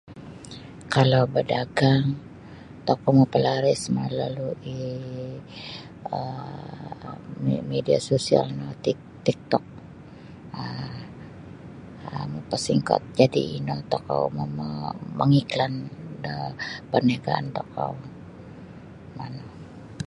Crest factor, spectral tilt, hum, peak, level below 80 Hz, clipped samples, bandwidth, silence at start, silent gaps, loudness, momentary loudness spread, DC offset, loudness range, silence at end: 24 dB; -6.5 dB/octave; none; -2 dBFS; -56 dBFS; under 0.1%; 11 kHz; 0.05 s; none; -25 LUFS; 22 LU; under 0.1%; 9 LU; 0 s